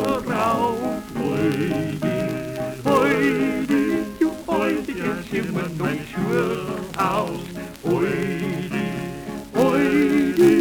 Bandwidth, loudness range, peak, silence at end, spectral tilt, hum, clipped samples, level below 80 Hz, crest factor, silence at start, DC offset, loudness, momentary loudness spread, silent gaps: over 20 kHz; 3 LU; -6 dBFS; 0 s; -6.5 dB/octave; none; under 0.1%; -48 dBFS; 16 dB; 0 s; under 0.1%; -22 LUFS; 9 LU; none